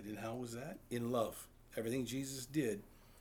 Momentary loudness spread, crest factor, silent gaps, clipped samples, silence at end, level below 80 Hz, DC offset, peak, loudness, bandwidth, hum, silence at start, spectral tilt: 10 LU; 18 dB; none; under 0.1%; 0 s; -66 dBFS; under 0.1%; -24 dBFS; -42 LUFS; over 20 kHz; none; 0 s; -5 dB/octave